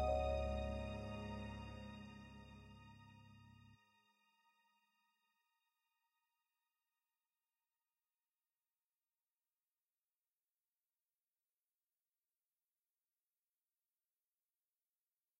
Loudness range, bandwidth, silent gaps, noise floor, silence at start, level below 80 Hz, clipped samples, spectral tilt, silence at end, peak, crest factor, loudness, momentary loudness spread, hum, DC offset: 20 LU; 11 kHz; none; under -90 dBFS; 0 s; -58 dBFS; under 0.1%; -7 dB/octave; 11.65 s; -28 dBFS; 24 dB; -46 LUFS; 23 LU; none; under 0.1%